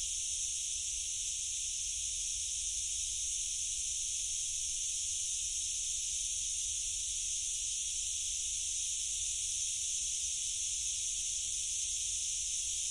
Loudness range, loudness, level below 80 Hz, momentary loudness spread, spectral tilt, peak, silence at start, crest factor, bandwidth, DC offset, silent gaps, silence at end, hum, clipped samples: 1 LU; -33 LUFS; -56 dBFS; 1 LU; 3 dB/octave; -24 dBFS; 0 s; 14 dB; 11.5 kHz; under 0.1%; none; 0 s; none; under 0.1%